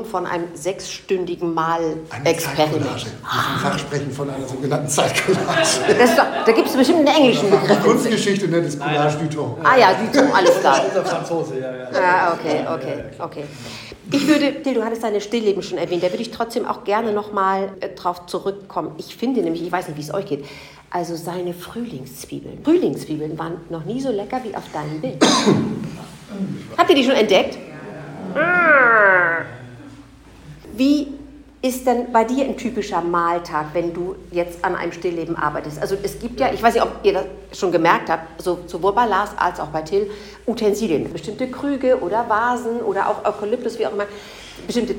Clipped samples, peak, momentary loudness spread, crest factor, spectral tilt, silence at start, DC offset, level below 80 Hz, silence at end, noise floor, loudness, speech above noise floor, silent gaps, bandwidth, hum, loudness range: under 0.1%; 0 dBFS; 15 LU; 18 dB; -4.5 dB/octave; 0 s; under 0.1%; -50 dBFS; 0 s; -43 dBFS; -19 LUFS; 24 dB; none; 17 kHz; none; 8 LU